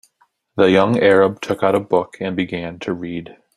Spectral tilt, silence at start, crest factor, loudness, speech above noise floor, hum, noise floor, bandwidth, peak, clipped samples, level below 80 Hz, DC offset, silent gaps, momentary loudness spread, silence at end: -6.5 dB/octave; 0.55 s; 18 dB; -17 LUFS; 45 dB; none; -62 dBFS; 11.5 kHz; 0 dBFS; under 0.1%; -56 dBFS; under 0.1%; none; 13 LU; 0.25 s